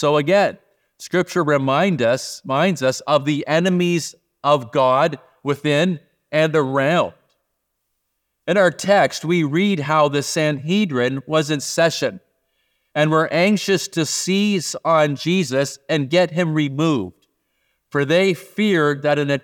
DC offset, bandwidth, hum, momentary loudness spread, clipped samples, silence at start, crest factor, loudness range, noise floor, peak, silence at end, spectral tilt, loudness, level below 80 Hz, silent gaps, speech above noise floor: under 0.1%; 18.5 kHz; none; 7 LU; under 0.1%; 0 s; 16 dB; 2 LU; -74 dBFS; -2 dBFS; 0.05 s; -5 dB/octave; -19 LUFS; -70 dBFS; none; 56 dB